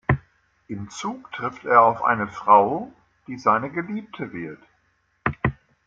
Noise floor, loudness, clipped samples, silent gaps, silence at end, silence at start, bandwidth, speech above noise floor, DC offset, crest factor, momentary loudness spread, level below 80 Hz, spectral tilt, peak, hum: -67 dBFS; -22 LUFS; under 0.1%; none; 0.35 s; 0.1 s; 7.8 kHz; 45 dB; under 0.1%; 20 dB; 19 LU; -48 dBFS; -6.5 dB/octave; -2 dBFS; none